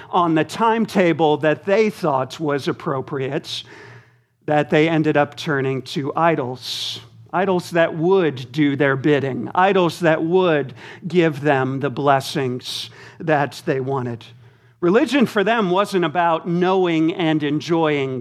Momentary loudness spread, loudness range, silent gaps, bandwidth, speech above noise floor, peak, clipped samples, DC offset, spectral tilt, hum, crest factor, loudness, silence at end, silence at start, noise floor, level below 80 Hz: 9 LU; 3 LU; none; 14.5 kHz; 34 dB; -2 dBFS; under 0.1%; under 0.1%; -6 dB/octave; none; 18 dB; -19 LUFS; 0 s; 0 s; -53 dBFS; -68 dBFS